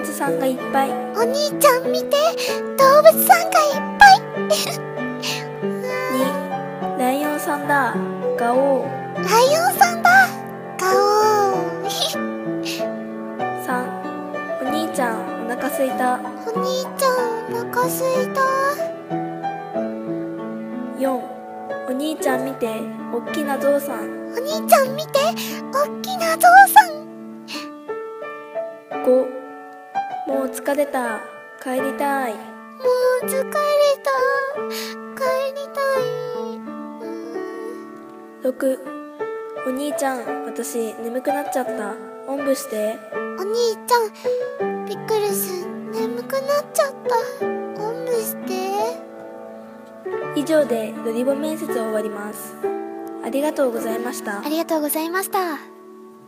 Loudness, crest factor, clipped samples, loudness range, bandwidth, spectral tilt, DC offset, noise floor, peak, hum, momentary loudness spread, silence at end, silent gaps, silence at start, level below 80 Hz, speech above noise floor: -20 LUFS; 20 dB; under 0.1%; 10 LU; 15.5 kHz; -3.5 dB/octave; under 0.1%; -42 dBFS; 0 dBFS; none; 15 LU; 0 s; none; 0 s; -62 dBFS; 23 dB